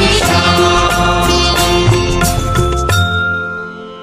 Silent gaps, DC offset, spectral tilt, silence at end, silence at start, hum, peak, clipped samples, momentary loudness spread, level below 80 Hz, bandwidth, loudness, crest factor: none; 0.2%; -4 dB/octave; 0 s; 0 s; none; 0 dBFS; under 0.1%; 7 LU; -22 dBFS; 16 kHz; -12 LUFS; 12 dB